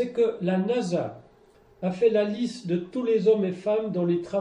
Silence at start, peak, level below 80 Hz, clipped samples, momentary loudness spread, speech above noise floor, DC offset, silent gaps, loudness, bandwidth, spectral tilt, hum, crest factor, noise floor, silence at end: 0 s; -10 dBFS; -66 dBFS; under 0.1%; 8 LU; 32 dB; under 0.1%; none; -25 LUFS; 9.8 kHz; -7.5 dB/octave; none; 16 dB; -57 dBFS; 0 s